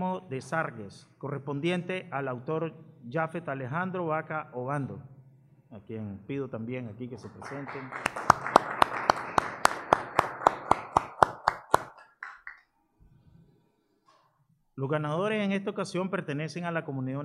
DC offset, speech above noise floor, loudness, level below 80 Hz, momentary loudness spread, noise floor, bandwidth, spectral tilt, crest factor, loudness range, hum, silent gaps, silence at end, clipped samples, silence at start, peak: under 0.1%; 37 dB; -30 LUFS; -62 dBFS; 17 LU; -70 dBFS; 14 kHz; -5.5 dB/octave; 32 dB; 11 LU; none; none; 0 s; under 0.1%; 0 s; 0 dBFS